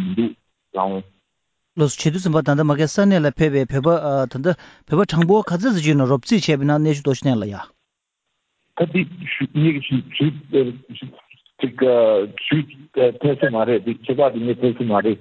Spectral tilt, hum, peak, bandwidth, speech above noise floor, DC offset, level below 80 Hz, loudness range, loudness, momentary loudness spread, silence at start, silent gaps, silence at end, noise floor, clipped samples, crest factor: -6.5 dB/octave; none; -4 dBFS; 8 kHz; 59 dB; under 0.1%; -52 dBFS; 4 LU; -19 LUFS; 10 LU; 0 s; none; 0.05 s; -77 dBFS; under 0.1%; 16 dB